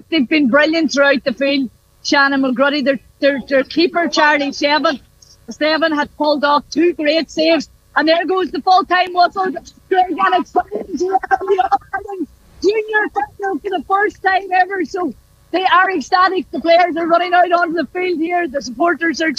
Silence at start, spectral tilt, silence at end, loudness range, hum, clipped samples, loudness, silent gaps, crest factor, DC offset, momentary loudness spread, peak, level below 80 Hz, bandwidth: 0.1 s; -3.5 dB/octave; 0.05 s; 3 LU; none; under 0.1%; -15 LUFS; none; 14 dB; under 0.1%; 9 LU; 0 dBFS; -52 dBFS; 9.4 kHz